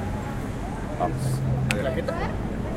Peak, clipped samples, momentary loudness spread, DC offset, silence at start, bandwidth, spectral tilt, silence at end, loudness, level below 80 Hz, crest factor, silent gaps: -2 dBFS; under 0.1%; 7 LU; under 0.1%; 0 s; 15.5 kHz; -6.5 dB/octave; 0 s; -27 LUFS; -36 dBFS; 24 dB; none